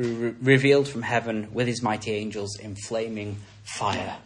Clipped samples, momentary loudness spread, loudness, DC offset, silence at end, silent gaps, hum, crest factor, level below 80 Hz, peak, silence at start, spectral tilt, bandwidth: under 0.1%; 15 LU; -25 LUFS; under 0.1%; 0.05 s; none; none; 20 dB; -60 dBFS; -6 dBFS; 0 s; -5.5 dB/octave; 11 kHz